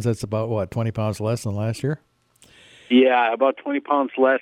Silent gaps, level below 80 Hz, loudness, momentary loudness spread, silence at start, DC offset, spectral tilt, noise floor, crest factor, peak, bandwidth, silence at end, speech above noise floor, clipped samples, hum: none; -56 dBFS; -22 LUFS; 10 LU; 0 s; under 0.1%; -6.5 dB/octave; -55 dBFS; 16 dB; -4 dBFS; 14 kHz; 0 s; 35 dB; under 0.1%; none